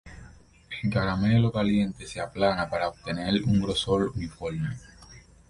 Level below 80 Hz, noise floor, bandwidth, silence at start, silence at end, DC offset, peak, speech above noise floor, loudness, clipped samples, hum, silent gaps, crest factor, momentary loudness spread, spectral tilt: -46 dBFS; -51 dBFS; 11.5 kHz; 0.05 s; 0.3 s; under 0.1%; -8 dBFS; 25 dB; -27 LUFS; under 0.1%; none; none; 18 dB; 11 LU; -6.5 dB/octave